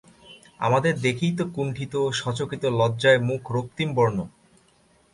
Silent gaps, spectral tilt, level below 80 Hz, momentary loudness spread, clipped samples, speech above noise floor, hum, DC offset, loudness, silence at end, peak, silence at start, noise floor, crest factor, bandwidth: none; -6 dB/octave; -56 dBFS; 9 LU; under 0.1%; 37 dB; none; under 0.1%; -24 LUFS; 0.85 s; -6 dBFS; 0.25 s; -60 dBFS; 20 dB; 11.5 kHz